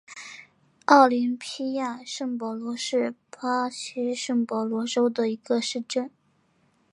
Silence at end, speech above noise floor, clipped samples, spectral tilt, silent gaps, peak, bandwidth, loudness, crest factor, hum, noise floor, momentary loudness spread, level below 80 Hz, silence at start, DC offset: 0.85 s; 41 dB; under 0.1%; -3.5 dB/octave; none; -2 dBFS; 11 kHz; -25 LUFS; 24 dB; none; -66 dBFS; 15 LU; -82 dBFS; 0.1 s; under 0.1%